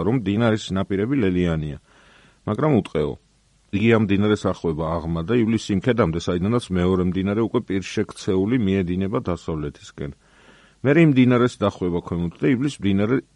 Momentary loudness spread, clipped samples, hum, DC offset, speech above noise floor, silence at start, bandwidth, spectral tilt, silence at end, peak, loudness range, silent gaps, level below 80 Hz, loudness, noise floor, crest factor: 11 LU; under 0.1%; none; under 0.1%; 32 dB; 0 s; 11 kHz; -7.5 dB/octave; 0.15 s; -4 dBFS; 3 LU; none; -46 dBFS; -21 LUFS; -53 dBFS; 18 dB